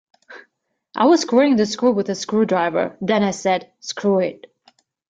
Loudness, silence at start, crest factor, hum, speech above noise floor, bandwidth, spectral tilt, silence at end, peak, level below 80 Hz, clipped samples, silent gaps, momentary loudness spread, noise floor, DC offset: -19 LUFS; 0.3 s; 16 dB; none; 51 dB; 9.2 kHz; -5 dB/octave; 0.75 s; -2 dBFS; -64 dBFS; under 0.1%; none; 8 LU; -69 dBFS; under 0.1%